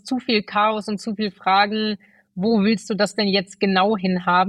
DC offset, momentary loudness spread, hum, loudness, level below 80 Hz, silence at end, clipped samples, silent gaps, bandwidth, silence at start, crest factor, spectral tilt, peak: under 0.1%; 8 LU; none; -20 LUFS; -62 dBFS; 0 s; under 0.1%; none; 11.5 kHz; 0.05 s; 16 dB; -5.5 dB/octave; -4 dBFS